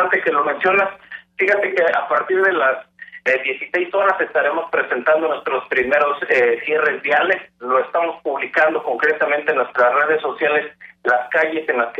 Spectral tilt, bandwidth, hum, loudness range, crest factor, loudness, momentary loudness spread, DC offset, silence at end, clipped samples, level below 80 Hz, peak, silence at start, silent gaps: -5 dB/octave; 7.6 kHz; none; 1 LU; 14 dB; -18 LUFS; 6 LU; under 0.1%; 0 s; under 0.1%; -66 dBFS; -4 dBFS; 0 s; none